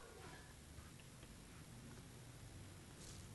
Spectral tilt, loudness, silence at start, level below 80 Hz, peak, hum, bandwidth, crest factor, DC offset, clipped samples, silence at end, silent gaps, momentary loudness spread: -4 dB/octave; -58 LUFS; 0 s; -66 dBFS; -40 dBFS; none; 12 kHz; 16 dB; under 0.1%; under 0.1%; 0 s; none; 2 LU